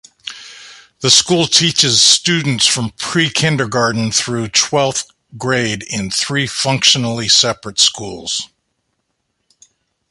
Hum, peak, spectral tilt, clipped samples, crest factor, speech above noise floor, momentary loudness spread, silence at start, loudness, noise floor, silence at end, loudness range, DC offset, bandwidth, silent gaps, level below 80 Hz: none; 0 dBFS; -2.5 dB/octave; under 0.1%; 16 dB; 55 dB; 15 LU; 0.25 s; -13 LUFS; -70 dBFS; 1.65 s; 4 LU; under 0.1%; 16 kHz; none; -50 dBFS